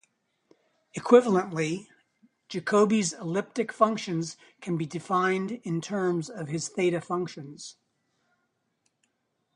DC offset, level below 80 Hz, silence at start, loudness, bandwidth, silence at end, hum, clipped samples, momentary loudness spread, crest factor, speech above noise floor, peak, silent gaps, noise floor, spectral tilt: under 0.1%; -74 dBFS; 0.95 s; -27 LUFS; 11 kHz; 1.85 s; none; under 0.1%; 16 LU; 24 dB; 50 dB; -4 dBFS; none; -77 dBFS; -5.5 dB/octave